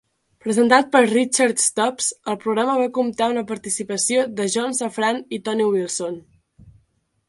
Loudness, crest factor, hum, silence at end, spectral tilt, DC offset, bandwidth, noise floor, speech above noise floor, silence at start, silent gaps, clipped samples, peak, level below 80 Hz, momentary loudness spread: -20 LUFS; 20 dB; none; 0.6 s; -2.5 dB/octave; under 0.1%; 12 kHz; -65 dBFS; 45 dB; 0.45 s; none; under 0.1%; 0 dBFS; -64 dBFS; 10 LU